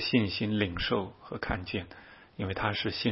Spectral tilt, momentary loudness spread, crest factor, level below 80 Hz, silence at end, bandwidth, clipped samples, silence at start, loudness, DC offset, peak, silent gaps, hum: -9 dB/octave; 14 LU; 20 dB; -50 dBFS; 0 s; 6 kHz; under 0.1%; 0 s; -32 LUFS; under 0.1%; -12 dBFS; none; none